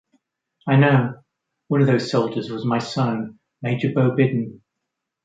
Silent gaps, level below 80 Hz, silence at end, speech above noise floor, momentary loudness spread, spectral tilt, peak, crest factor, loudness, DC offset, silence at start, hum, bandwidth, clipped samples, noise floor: none; -62 dBFS; 0.7 s; 61 dB; 12 LU; -7.5 dB/octave; -4 dBFS; 18 dB; -21 LUFS; under 0.1%; 0.65 s; none; 7.8 kHz; under 0.1%; -81 dBFS